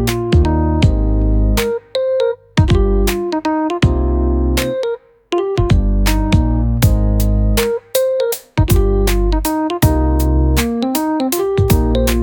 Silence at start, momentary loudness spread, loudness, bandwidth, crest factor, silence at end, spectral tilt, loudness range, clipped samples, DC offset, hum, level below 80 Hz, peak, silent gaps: 0 s; 4 LU; -16 LUFS; 19.5 kHz; 14 dB; 0 s; -6 dB/octave; 1 LU; under 0.1%; under 0.1%; none; -18 dBFS; 0 dBFS; none